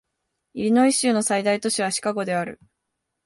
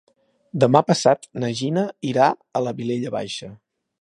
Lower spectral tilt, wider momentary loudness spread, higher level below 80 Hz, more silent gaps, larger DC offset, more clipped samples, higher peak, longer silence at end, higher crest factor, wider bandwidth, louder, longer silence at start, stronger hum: second, -3.5 dB/octave vs -5.5 dB/octave; second, 10 LU vs 14 LU; about the same, -66 dBFS vs -66 dBFS; neither; neither; neither; second, -6 dBFS vs 0 dBFS; first, 0.7 s vs 0.45 s; second, 16 dB vs 22 dB; about the same, 11.5 kHz vs 11.5 kHz; about the same, -21 LUFS vs -21 LUFS; about the same, 0.55 s vs 0.55 s; neither